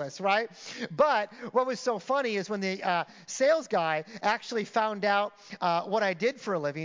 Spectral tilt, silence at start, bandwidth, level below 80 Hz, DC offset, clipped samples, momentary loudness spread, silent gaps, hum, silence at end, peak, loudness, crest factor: -4 dB/octave; 0 s; 7.6 kHz; -80 dBFS; under 0.1%; under 0.1%; 6 LU; none; none; 0 s; -12 dBFS; -29 LUFS; 16 dB